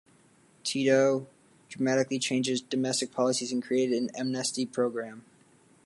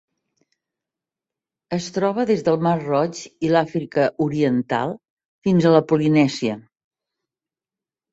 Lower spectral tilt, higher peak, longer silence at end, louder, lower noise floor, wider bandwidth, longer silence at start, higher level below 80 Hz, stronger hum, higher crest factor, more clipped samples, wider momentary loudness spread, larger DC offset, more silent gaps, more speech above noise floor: second, -4 dB/octave vs -7 dB/octave; second, -12 dBFS vs -2 dBFS; second, 0.65 s vs 1.55 s; second, -28 LUFS vs -20 LUFS; second, -61 dBFS vs under -90 dBFS; first, 11.5 kHz vs 8 kHz; second, 0.65 s vs 1.7 s; second, -78 dBFS vs -60 dBFS; neither; about the same, 18 dB vs 20 dB; neither; about the same, 9 LU vs 11 LU; neither; second, none vs 5.10-5.17 s, 5.25-5.42 s; second, 33 dB vs over 71 dB